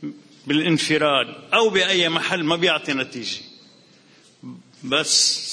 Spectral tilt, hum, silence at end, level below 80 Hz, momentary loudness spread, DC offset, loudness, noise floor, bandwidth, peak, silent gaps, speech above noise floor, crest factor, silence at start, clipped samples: -2.5 dB/octave; none; 0 s; -66 dBFS; 13 LU; under 0.1%; -19 LUFS; -53 dBFS; 10.5 kHz; -4 dBFS; none; 33 dB; 18 dB; 0 s; under 0.1%